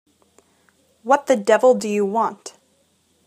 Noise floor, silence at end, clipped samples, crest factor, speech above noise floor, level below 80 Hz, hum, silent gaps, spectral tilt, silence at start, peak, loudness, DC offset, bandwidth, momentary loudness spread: -62 dBFS; 0.8 s; under 0.1%; 20 dB; 45 dB; -76 dBFS; none; none; -4.5 dB/octave; 1.05 s; 0 dBFS; -18 LUFS; under 0.1%; 14.5 kHz; 21 LU